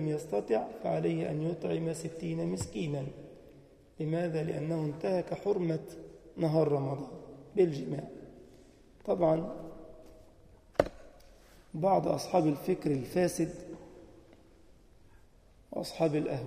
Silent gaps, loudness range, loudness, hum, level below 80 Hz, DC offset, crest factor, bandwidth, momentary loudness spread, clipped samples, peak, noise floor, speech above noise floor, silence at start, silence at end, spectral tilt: none; 4 LU; -33 LUFS; none; -60 dBFS; under 0.1%; 26 dB; 15.5 kHz; 19 LU; under 0.1%; -6 dBFS; -60 dBFS; 28 dB; 0 s; 0 s; -7 dB/octave